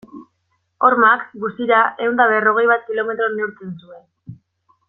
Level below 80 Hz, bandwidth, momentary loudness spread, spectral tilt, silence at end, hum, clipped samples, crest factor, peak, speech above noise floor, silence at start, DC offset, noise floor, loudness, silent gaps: -66 dBFS; 4.1 kHz; 13 LU; -8 dB/octave; 0.55 s; none; under 0.1%; 18 dB; -2 dBFS; 51 dB; 0.15 s; under 0.1%; -68 dBFS; -16 LUFS; none